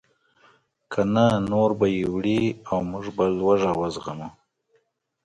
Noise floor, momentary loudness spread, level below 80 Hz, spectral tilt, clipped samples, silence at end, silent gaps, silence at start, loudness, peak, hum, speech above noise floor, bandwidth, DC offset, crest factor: -68 dBFS; 12 LU; -52 dBFS; -7 dB/octave; under 0.1%; 0.95 s; none; 0.9 s; -23 LUFS; -6 dBFS; none; 46 dB; 11 kHz; under 0.1%; 18 dB